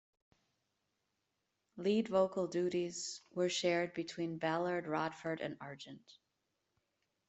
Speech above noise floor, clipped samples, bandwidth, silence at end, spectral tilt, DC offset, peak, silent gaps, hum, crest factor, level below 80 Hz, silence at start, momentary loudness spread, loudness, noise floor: 48 dB; under 0.1%; 8.2 kHz; 1.3 s; -4.5 dB/octave; under 0.1%; -20 dBFS; none; none; 20 dB; -80 dBFS; 1.75 s; 13 LU; -37 LUFS; -85 dBFS